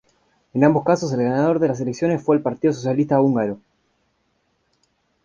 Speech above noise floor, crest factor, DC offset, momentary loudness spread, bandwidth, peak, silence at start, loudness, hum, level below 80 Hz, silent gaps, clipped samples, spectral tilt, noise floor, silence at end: 49 dB; 18 dB; under 0.1%; 6 LU; 7.4 kHz; -2 dBFS; 0.55 s; -20 LUFS; none; -58 dBFS; none; under 0.1%; -7.5 dB/octave; -68 dBFS; 1.65 s